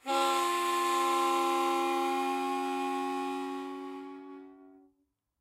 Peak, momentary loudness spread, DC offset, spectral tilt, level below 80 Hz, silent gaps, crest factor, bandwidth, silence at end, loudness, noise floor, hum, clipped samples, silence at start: -16 dBFS; 16 LU; under 0.1%; -1 dB/octave; -84 dBFS; none; 16 dB; 16 kHz; 0.65 s; -30 LUFS; -77 dBFS; none; under 0.1%; 0.05 s